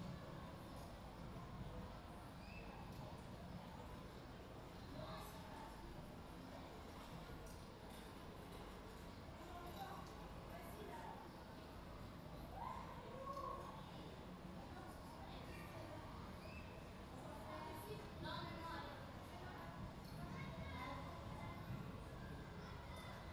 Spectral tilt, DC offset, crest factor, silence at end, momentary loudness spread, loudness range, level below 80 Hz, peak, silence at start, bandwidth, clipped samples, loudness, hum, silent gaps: -6 dB/octave; under 0.1%; 16 dB; 0 s; 6 LU; 3 LU; -62 dBFS; -38 dBFS; 0 s; over 20 kHz; under 0.1%; -54 LUFS; none; none